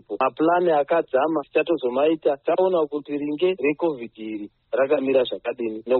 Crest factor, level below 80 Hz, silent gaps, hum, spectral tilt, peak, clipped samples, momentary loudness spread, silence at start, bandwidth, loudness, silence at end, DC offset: 14 dB; -68 dBFS; none; none; -4 dB/octave; -8 dBFS; under 0.1%; 9 LU; 0.1 s; 4.3 kHz; -22 LUFS; 0 s; under 0.1%